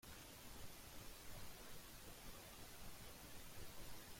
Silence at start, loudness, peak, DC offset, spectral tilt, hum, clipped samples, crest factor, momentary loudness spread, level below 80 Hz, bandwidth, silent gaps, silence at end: 0.05 s; -57 LUFS; -40 dBFS; under 0.1%; -3 dB/octave; none; under 0.1%; 14 dB; 1 LU; -64 dBFS; 16.5 kHz; none; 0 s